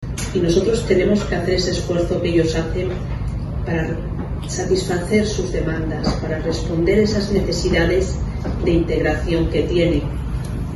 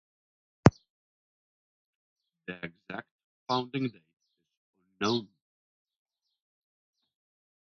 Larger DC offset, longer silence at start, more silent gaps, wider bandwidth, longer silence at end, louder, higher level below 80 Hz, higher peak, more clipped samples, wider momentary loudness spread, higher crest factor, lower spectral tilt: neither; second, 0 s vs 0.65 s; second, none vs 0.90-2.16 s, 3.11-3.46 s, 4.13-4.17 s, 4.57-4.73 s; first, 12 kHz vs 6.8 kHz; second, 0 s vs 2.45 s; first, -20 LUFS vs -30 LUFS; first, -28 dBFS vs -54 dBFS; about the same, -2 dBFS vs -2 dBFS; neither; second, 8 LU vs 19 LU; second, 16 dB vs 32 dB; about the same, -6 dB/octave vs -5.5 dB/octave